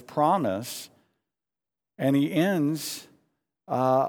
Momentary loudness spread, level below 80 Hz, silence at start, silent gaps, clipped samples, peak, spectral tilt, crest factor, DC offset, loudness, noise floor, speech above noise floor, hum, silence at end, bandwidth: 14 LU; -76 dBFS; 0.1 s; none; under 0.1%; -10 dBFS; -6 dB/octave; 18 dB; under 0.1%; -26 LUFS; under -90 dBFS; over 65 dB; none; 0 s; over 20 kHz